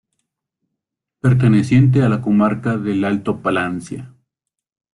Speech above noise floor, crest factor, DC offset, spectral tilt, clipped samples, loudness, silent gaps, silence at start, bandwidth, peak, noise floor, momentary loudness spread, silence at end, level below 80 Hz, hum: 65 dB; 16 dB; under 0.1%; -8 dB/octave; under 0.1%; -16 LUFS; none; 1.25 s; 11 kHz; -2 dBFS; -81 dBFS; 11 LU; 0.85 s; -50 dBFS; none